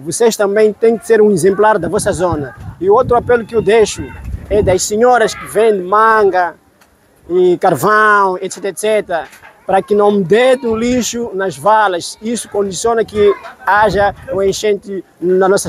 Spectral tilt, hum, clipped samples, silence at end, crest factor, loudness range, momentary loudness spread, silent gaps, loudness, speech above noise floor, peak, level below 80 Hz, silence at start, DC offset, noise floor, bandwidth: -4.5 dB/octave; none; under 0.1%; 0 s; 12 dB; 2 LU; 10 LU; none; -13 LUFS; 37 dB; 0 dBFS; -38 dBFS; 0 s; under 0.1%; -50 dBFS; 15.5 kHz